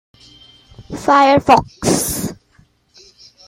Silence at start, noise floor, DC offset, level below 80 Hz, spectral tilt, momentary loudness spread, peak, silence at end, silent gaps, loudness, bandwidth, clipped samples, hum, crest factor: 0.8 s; -54 dBFS; under 0.1%; -44 dBFS; -4 dB/octave; 14 LU; 0 dBFS; 1.15 s; none; -14 LUFS; 16.5 kHz; under 0.1%; none; 16 dB